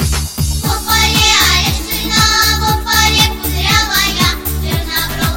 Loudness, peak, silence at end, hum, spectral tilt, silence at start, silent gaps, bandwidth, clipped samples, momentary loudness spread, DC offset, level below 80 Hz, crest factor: -12 LUFS; 0 dBFS; 0 s; none; -2.5 dB/octave; 0 s; none; 17 kHz; under 0.1%; 8 LU; under 0.1%; -22 dBFS; 14 dB